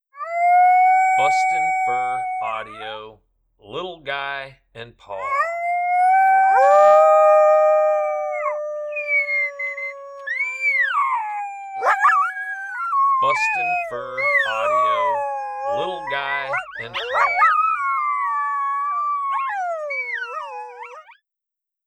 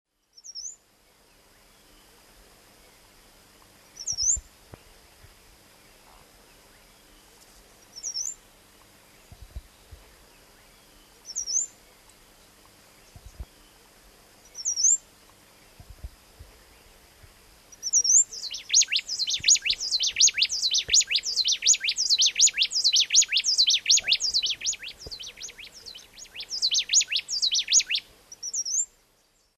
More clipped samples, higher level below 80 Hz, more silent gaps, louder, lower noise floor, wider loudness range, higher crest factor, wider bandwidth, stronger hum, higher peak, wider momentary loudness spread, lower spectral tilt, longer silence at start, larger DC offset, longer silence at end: neither; second, -64 dBFS vs -56 dBFS; neither; first, -19 LUFS vs -22 LUFS; first, -85 dBFS vs -65 dBFS; second, 10 LU vs 19 LU; second, 16 dB vs 22 dB; second, 12 kHz vs 13.5 kHz; second, none vs 50 Hz at -75 dBFS; about the same, -4 dBFS vs -6 dBFS; second, 16 LU vs 19 LU; first, -2.5 dB/octave vs 3 dB/octave; second, 0.15 s vs 0.45 s; neither; first, 0.85 s vs 0.7 s